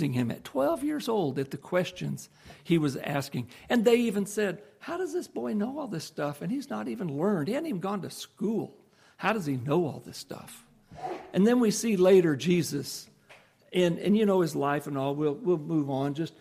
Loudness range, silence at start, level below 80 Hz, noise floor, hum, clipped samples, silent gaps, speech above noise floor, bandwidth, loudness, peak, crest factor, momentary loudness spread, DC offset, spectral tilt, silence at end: 6 LU; 0 s; -68 dBFS; -57 dBFS; none; under 0.1%; none; 29 dB; 15.5 kHz; -28 LUFS; -10 dBFS; 18 dB; 14 LU; under 0.1%; -6 dB/octave; 0.1 s